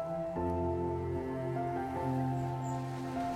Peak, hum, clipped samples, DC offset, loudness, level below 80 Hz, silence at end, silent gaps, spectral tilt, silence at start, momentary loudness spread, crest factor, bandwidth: -22 dBFS; none; under 0.1%; under 0.1%; -36 LUFS; -58 dBFS; 0 s; none; -8 dB/octave; 0 s; 3 LU; 12 dB; 13.5 kHz